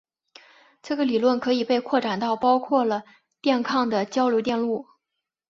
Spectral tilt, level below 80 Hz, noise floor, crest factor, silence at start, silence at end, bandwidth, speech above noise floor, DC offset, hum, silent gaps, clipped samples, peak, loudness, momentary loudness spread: -5 dB/octave; -68 dBFS; -83 dBFS; 18 dB; 0.85 s; 0.65 s; 7.4 kHz; 61 dB; under 0.1%; none; none; under 0.1%; -6 dBFS; -23 LUFS; 7 LU